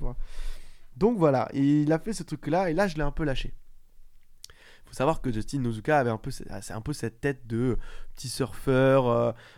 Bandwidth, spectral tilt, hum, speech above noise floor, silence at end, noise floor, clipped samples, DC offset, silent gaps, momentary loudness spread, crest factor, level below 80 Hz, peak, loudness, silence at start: 15.5 kHz; -6.5 dB/octave; none; 23 dB; 0.1 s; -50 dBFS; under 0.1%; under 0.1%; none; 17 LU; 20 dB; -38 dBFS; -8 dBFS; -27 LUFS; 0 s